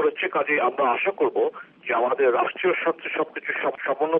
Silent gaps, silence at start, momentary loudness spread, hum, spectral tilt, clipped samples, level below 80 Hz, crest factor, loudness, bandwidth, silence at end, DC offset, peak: none; 0 s; 6 LU; none; -1.5 dB/octave; under 0.1%; -82 dBFS; 14 dB; -23 LUFS; 3.8 kHz; 0 s; under 0.1%; -10 dBFS